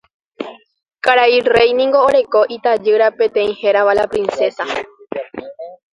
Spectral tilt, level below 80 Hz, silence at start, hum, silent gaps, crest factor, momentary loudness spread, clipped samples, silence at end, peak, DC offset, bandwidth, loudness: -4 dB/octave; -52 dBFS; 0.4 s; none; none; 16 dB; 19 LU; under 0.1%; 0.2 s; 0 dBFS; under 0.1%; 11 kHz; -14 LUFS